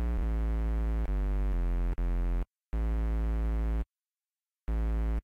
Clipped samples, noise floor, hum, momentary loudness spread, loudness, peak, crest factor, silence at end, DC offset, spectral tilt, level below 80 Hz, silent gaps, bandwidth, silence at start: under 0.1%; under -90 dBFS; none; 5 LU; -34 LUFS; -26 dBFS; 6 dB; 0.05 s; under 0.1%; -9 dB/octave; -30 dBFS; none; 3.4 kHz; 0 s